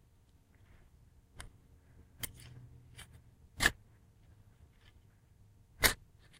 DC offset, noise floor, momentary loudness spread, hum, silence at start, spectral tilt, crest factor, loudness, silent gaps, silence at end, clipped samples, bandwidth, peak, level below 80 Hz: under 0.1%; -66 dBFS; 26 LU; none; 1.4 s; -1.5 dB/octave; 32 dB; -34 LUFS; none; 0.45 s; under 0.1%; 16 kHz; -10 dBFS; -52 dBFS